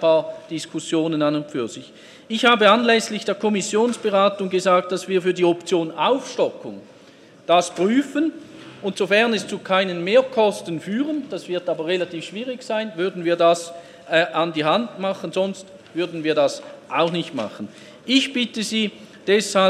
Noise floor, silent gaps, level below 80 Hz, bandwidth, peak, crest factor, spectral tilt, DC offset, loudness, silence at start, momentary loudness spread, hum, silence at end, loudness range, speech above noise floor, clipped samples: -48 dBFS; none; -72 dBFS; 13.5 kHz; 0 dBFS; 20 dB; -4 dB/octave; under 0.1%; -21 LUFS; 0 s; 13 LU; none; 0 s; 4 LU; 27 dB; under 0.1%